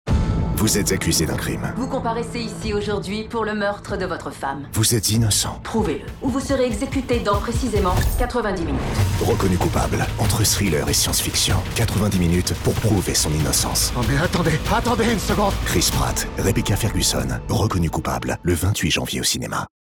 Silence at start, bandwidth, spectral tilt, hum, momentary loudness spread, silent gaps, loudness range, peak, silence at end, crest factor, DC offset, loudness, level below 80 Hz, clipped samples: 0.05 s; over 20 kHz; -4 dB/octave; none; 7 LU; none; 3 LU; -6 dBFS; 0.3 s; 16 dB; under 0.1%; -20 LUFS; -30 dBFS; under 0.1%